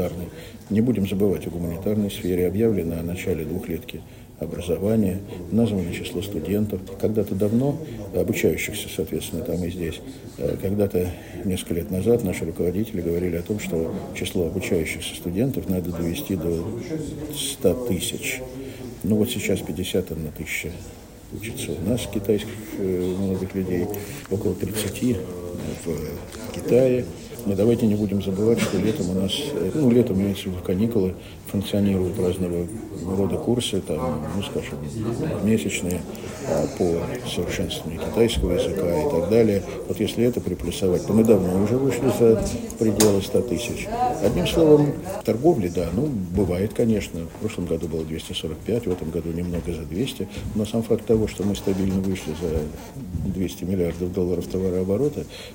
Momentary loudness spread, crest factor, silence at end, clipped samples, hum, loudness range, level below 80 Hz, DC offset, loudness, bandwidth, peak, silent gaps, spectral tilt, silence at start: 11 LU; 24 dB; 0 s; under 0.1%; none; 6 LU; -44 dBFS; under 0.1%; -24 LUFS; 16.5 kHz; 0 dBFS; none; -6 dB/octave; 0 s